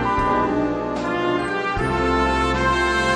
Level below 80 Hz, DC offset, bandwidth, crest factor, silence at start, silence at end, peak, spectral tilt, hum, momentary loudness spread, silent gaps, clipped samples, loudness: -32 dBFS; under 0.1%; 10.5 kHz; 14 dB; 0 s; 0 s; -6 dBFS; -5.5 dB/octave; none; 4 LU; none; under 0.1%; -20 LUFS